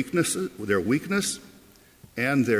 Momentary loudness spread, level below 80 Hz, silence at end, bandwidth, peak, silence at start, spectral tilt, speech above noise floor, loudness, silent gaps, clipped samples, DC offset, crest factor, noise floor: 8 LU; -58 dBFS; 0 s; 16 kHz; -8 dBFS; 0 s; -4.5 dB/octave; 29 dB; -26 LUFS; none; under 0.1%; under 0.1%; 18 dB; -54 dBFS